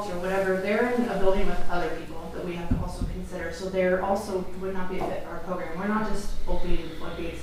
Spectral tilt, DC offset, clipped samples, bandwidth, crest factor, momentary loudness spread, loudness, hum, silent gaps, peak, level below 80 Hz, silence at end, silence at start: -6 dB/octave; under 0.1%; under 0.1%; 12 kHz; 14 dB; 10 LU; -29 LUFS; none; none; -10 dBFS; -34 dBFS; 0 s; 0 s